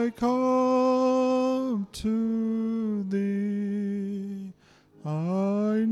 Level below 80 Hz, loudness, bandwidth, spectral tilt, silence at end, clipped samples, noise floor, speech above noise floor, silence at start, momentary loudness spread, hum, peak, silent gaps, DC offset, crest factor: -58 dBFS; -26 LUFS; 12 kHz; -7.5 dB/octave; 0 s; under 0.1%; -57 dBFS; 32 dB; 0 s; 11 LU; none; -14 dBFS; none; under 0.1%; 12 dB